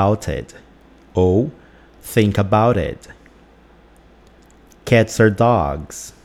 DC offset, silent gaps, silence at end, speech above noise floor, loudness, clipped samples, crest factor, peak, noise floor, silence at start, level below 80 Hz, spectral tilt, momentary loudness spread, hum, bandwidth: under 0.1%; none; 0.15 s; 31 dB; -17 LUFS; under 0.1%; 18 dB; -2 dBFS; -48 dBFS; 0 s; -40 dBFS; -6.5 dB/octave; 18 LU; none; 15.5 kHz